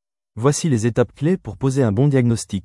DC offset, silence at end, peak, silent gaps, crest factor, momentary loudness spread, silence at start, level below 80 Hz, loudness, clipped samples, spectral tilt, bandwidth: under 0.1%; 0.05 s; -4 dBFS; none; 14 dB; 5 LU; 0.35 s; -48 dBFS; -19 LUFS; under 0.1%; -6.5 dB/octave; 12 kHz